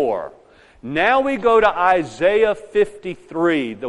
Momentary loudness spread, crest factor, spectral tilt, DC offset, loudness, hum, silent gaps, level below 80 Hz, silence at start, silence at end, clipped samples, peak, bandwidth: 13 LU; 16 dB; -5.5 dB/octave; under 0.1%; -18 LUFS; none; none; -48 dBFS; 0 s; 0 s; under 0.1%; -2 dBFS; 11 kHz